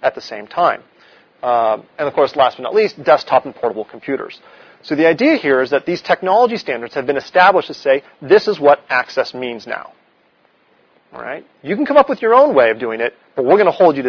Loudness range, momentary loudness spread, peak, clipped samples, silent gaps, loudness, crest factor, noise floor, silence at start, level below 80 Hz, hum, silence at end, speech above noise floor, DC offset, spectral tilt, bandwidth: 4 LU; 14 LU; 0 dBFS; under 0.1%; none; -15 LUFS; 16 dB; -56 dBFS; 0 s; -62 dBFS; none; 0 s; 41 dB; under 0.1%; -6 dB/octave; 5.4 kHz